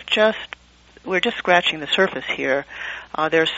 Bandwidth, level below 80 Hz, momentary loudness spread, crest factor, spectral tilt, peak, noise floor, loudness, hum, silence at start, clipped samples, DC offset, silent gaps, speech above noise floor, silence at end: 8 kHz; -56 dBFS; 14 LU; 20 dB; -1 dB/octave; -2 dBFS; -50 dBFS; -20 LUFS; 60 Hz at -55 dBFS; 0 s; under 0.1%; under 0.1%; none; 30 dB; 0 s